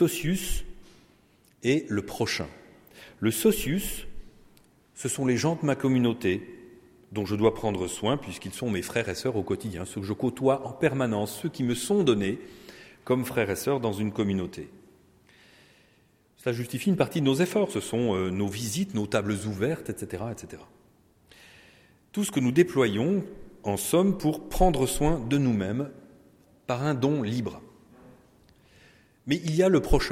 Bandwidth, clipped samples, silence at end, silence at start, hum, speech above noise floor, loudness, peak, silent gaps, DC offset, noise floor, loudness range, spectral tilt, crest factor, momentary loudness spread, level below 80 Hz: 16.5 kHz; under 0.1%; 0 s; 0 s; none; 37 dB; -27 LUFS; -6 dBFS; none; under 0.1%; -63 dBFS; 5 LU; -5.5 dB/octave; 22 dB; 13 LU; -42 dBFS